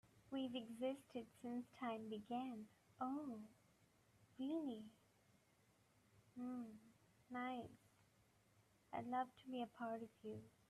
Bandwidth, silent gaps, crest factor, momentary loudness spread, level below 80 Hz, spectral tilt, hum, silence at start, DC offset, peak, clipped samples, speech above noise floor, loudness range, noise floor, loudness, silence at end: 13.5 kHz; none; 18 dB; 11 LU; -86 dBFS; -6 dB/octave; none; 0.05 s; under 0.1%; -32 dBFS; under 0.1%; 28 dB; 5 LU; -77 dBFS; -50 LUFS; 0.2 s